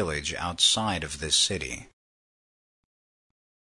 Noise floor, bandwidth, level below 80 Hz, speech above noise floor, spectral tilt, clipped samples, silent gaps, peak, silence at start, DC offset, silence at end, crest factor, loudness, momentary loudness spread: under -90 dBFS; 11 kHz; -52 dBFS; over 63 dB; -1.5 dB/octave; under 0.1%; none; -8 dBFS; 0 s; under 0.1%; 1.95 s; 22 dB; -24 LUFS; 12 LU